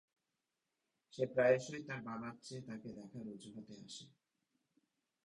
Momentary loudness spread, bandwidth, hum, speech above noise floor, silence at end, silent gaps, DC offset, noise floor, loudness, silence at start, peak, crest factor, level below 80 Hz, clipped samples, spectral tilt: 20 LU; 11 kHz; none; 49 dB; 1.15 s; none; under 0.1%; -89 dBFS; -40 LUFS; 1.15 s; -20 dBFS; 24 dB; -80 dBFS; under 0.1%; -5.5 dB/octave